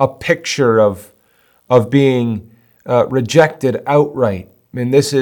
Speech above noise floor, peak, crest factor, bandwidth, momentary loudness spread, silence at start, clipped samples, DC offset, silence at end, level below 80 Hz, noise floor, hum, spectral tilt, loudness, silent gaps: 41 dB; 0 dBFS; 14 dB; 18 kHz; 13 LU; 0 s; under 0.1%; under 0.1%; 0 s; -56 dBFS; -55 dBFS; none; -6 dB/octave; -14 LUFS; none